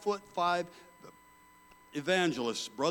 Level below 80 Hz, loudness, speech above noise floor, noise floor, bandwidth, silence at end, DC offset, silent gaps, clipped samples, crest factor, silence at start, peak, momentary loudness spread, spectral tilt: -74 dBFS; -32 LUFS; 28 dB; -60 dBFS; 18 kHz; 0 s; under 0.1%; none; under 0.1%; 20 dB; 0 s; -14 dBFS; 14 LU; -4 dB/octave